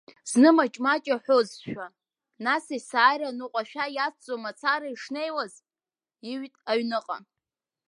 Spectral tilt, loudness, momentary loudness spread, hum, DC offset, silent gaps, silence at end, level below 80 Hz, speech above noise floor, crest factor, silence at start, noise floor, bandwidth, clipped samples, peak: -3.5 dB/octave; -26 LUFS; 17 LU; none; under 0.1%; none; 0.7 s; -78 dBFS; over 64 dB; 20 dB; 0.25 s; under -90 dBFS; 11.5 kHz; under 0.1%; -6 dBFS